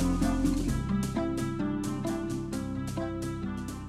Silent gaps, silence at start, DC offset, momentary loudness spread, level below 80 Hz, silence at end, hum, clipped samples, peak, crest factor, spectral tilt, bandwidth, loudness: none; 0 s; under 0.1%; 7 LU; -40 dBFS; 0 s; none; under 0.1%; -16 dBFS; 14 dB; -6.5 dB/octave; 15 kHz; -32 LUFS